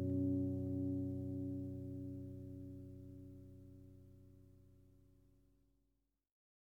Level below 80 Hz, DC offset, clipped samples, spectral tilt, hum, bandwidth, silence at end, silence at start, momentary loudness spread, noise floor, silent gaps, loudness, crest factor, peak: -70 dBFS; under 0.1%; under 0.1%; -11.5 dB/octave; none; 1.5 kHz; 1.7 s; 0 s; 23 LU; -84 dBFS; none; -44 LUFS; 16 dB; -28 dBFS